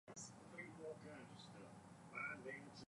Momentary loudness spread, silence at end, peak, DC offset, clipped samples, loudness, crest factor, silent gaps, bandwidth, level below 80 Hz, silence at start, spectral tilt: 11 LU; 0 s; -38 dBFS; under 0.1%; under 0.1%; -54 LUFS; 18 dB; none; 11.5 kHz; -84 dBFS; 0.05 s; -4 dB/octave